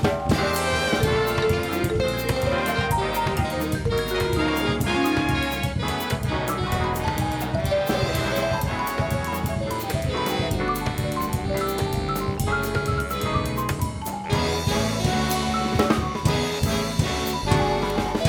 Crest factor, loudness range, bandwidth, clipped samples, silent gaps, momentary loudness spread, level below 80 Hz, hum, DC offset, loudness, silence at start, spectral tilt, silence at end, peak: 18 dB; 2 LU; over 20 kHz; under 0.1%; none; 4 LU; -36 dBFS; none; under 0.1%; -24 LUFS; 0 s; -5 dB/octave; 0 s; -6 dBFS